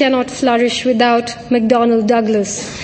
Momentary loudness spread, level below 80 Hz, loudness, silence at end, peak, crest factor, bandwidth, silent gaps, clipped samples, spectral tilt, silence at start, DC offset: 5 LU; -50 dBFS; -14 LUFS; 0 s; 0 dBFS; 14 dB; 8.8 kHz; none; under 0.1%; -4 dB/octave; 0 s; under 0.1%